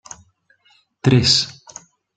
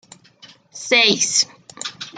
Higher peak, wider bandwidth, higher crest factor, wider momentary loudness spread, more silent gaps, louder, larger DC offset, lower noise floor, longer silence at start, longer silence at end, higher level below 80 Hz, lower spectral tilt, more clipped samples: about the same, 0 dBFS vs -2 dBFS; second, 9.4 kHz vs 12 kHz; about the same, 20 dB vs 20 dB; first, 26 LU vs 17 LU; neither; about the same, -16 LUFS vs -15 LUFS; neither; first, -59 dBFS vs -48 dBFS; first, 1.05 s vs 0.75 s; first, 0.65 s vs 0 s; first, -50 dBFS vs -70 dBFS; first, -4.5 dB/octave vs -0.5 dB/octave; neither